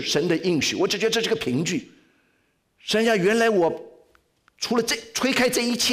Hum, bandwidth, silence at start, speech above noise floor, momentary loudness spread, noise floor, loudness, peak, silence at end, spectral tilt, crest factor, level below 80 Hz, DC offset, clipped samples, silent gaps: none; 16 kHz; 0 s; 45 dB; 7 LU; -68 dBFS; -22 LUFS; -12 dBFS; 0 s; -3.5 dB/octave; 12 dB; -60 dBFS; under 0.1%; under 0.1%; none